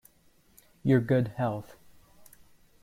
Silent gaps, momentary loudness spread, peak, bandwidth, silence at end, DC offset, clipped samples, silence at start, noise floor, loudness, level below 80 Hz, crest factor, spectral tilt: none; 10 LU; -12 dBFS; 15.5 kHz; 1.2 s; under 0.1%; under 0.1%; 0.85 s; -63 dBFS; -28 LUFS; -62 dBFS; 20 dB; -8.5 dB/octave